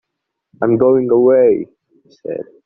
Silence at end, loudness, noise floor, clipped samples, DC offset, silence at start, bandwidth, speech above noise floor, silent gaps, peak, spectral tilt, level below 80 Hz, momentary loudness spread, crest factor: 0.25 s; -13 LUFS; -76 dBFS; under 0.1%; under 0.1%; 0.6 s; 2.7 kHz; 63 dB; none; -2 dBFS; -10 dB/octave; -58 dBFS; 18 LU; 14 dB